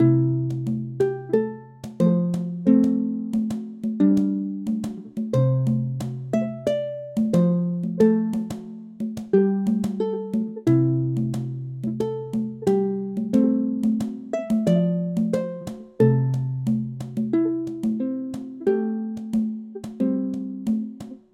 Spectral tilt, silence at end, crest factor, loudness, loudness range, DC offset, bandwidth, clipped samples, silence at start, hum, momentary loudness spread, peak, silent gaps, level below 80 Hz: -9.5 dB/octave; 0.2 s; 18 dB; -24 LUFS; 3 LU; under 0.1%; 12.5 kHz; under 0.1%; 0 s; none; 11 LU; -6 dBFS; none; -60 dBFS